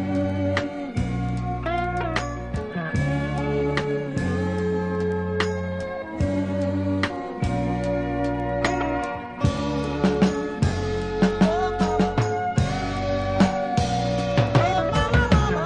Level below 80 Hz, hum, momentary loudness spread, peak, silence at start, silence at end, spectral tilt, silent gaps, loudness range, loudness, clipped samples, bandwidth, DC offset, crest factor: -34 dBFS; none; 7 LU; -4 dBFS; 0 s; 0 s; -6.5 dB/octave; none; 3 LU; -24 LUFS; under 0.1%; 10.5 kHz; under 0.1%; 18 dB